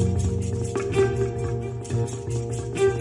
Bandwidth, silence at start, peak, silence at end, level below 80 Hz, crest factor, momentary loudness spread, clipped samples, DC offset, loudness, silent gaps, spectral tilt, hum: 11.5 kHz; 0 s; -8 dBFS; 0 s; -40 dBFS; 16 dB; 6 LU; under 0.1%; under 0.1%; -26 LUFS; none; -6.5 dB/octave; none